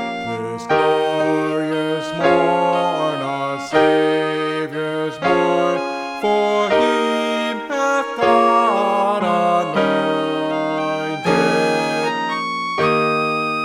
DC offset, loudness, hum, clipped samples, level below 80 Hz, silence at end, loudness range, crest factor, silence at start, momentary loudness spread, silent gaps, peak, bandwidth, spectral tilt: under 0.1%; -18 LUFS; none; under 0.1%; -58 dBFS; 0 s; 2 LU; 16 dB; 0 s; 7 LU; none; -2 dBFS; 14.5 kHz; -5 dB/octave